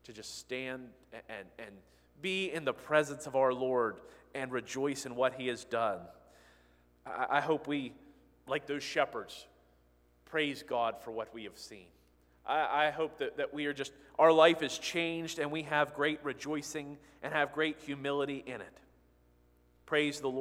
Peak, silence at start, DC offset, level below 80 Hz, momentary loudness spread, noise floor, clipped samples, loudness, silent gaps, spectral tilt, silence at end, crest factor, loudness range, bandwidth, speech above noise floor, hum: -10 dBFS; 0.1 s; under 0.1%; -70 dBFS; 16 LU; -67 dBFS; under 0.1%; -33 LUFS; none; -4 dB/octave; 0 s; 24 dB; 7 LU; 16 kHz; 33 dB; 60 Hz at -70 dBFS